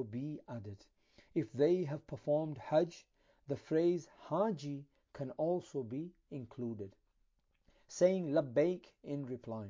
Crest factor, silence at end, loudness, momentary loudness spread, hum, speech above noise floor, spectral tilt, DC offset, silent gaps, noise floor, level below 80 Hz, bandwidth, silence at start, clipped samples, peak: 20 dB; 0 s; -37 LUFS; 16 LU; none; 40 dB; -7.5 dB/octave; under 0.1%; none; -76 dBFS; -74 dBFS; 7.6 kHz; 0 s; under 0.1%; -18 dBFS